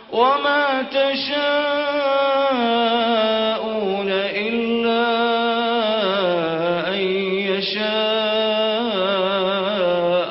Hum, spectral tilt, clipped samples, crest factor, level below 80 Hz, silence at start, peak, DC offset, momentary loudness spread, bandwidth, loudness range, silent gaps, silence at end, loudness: none; -9 dB/octave; under 0.1%; 16 dB; -62 dBFS; 0 s; -4 dBFS; under 0.1%; 3 LU; 5.8 kHz; 1 LU; none; 0 s; -19 LUFS